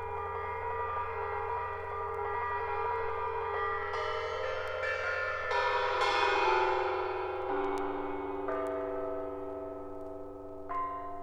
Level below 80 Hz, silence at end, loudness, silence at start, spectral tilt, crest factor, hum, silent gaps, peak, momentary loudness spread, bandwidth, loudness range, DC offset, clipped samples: -56 dBFS; 0 s; -34 LUFS; 0 s; -4.5 dB/octave; 20 dB; none; none; -14 dBFS; 11 LU; 11 kHz; 6 LU; under 0.1%; under 0.1%